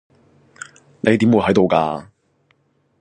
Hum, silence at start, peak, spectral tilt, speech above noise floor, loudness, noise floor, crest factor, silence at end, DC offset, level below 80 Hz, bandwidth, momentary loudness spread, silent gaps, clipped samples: none; 1.05 s; 0 dBFS; -7 dB/octave; 47 dB; -16 LUFS; -62 dBFS; 20 dB; 1 s; under 0.1%; -50 dBFS; 9.6 kHz; 23 LU; none; under 0.1%